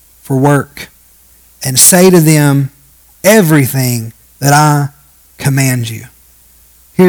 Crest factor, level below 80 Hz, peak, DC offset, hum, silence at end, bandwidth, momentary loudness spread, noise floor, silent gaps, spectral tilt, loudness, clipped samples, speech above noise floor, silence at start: 10 dB; -46 dBFS; 0 dBFS; under 0.1%; none; 0 s; over 20 kHz; 17 LU; -44 dBFS; none; -4.5 dB/octave; -9 LUFS; 1%; 36 dB; 0.3 s